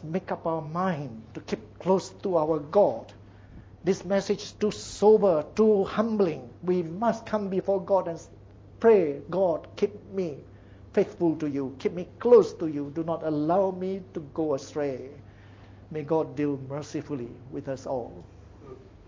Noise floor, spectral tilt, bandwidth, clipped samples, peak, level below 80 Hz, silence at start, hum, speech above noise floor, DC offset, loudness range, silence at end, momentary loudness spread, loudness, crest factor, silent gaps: -49 dBFS; -7 dB/octave; 8 kHz; under 0.1%; -6 dBFS; -56 dBFS; 0 s; none; 23 dB; under 0.1%; 7 LU; 0.25 s; 15 LU; -27 LUFS; 20 dB; none